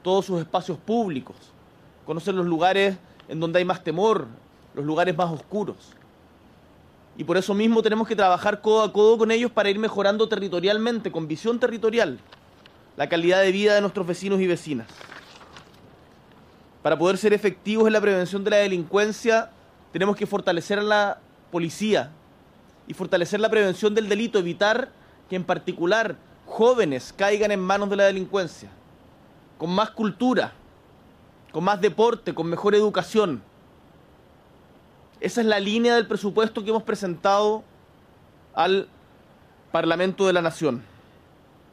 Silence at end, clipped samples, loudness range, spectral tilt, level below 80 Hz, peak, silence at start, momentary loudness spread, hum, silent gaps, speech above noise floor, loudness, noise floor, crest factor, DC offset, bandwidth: 0.9 s; under 0.1%; 5 LU; -5 dB/octave; -64 dBFS; -8 dBFS; 0.05 s; 12 LU; none; none; 31 dB; -23 LUFS; -53 dBFS; 16 dB; under 0.1%; 13.5 kHz